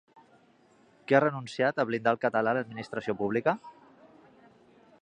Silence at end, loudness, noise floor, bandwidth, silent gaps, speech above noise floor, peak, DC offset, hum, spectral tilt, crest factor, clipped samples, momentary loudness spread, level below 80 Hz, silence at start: 1.3 s; -29 LUFS; -62 dBFS; 9.8 kHz; none; 34 dB; -6 dBFS; under 0.1%; none; -6.5 dB/octave; 24 dB; under 0.1%; 11 LU; -72 dBFS; 1.1 s